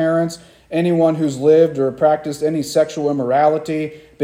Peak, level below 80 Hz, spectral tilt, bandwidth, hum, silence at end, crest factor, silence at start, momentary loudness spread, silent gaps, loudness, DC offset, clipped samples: -2 dBFS; -58 dBFS; -6.5 dB/octave; 15.5 kHz; none; 0 s; 14 dB; 0 s; 11 LU; none; -17 LUFS; under 0.1%; under 0.1%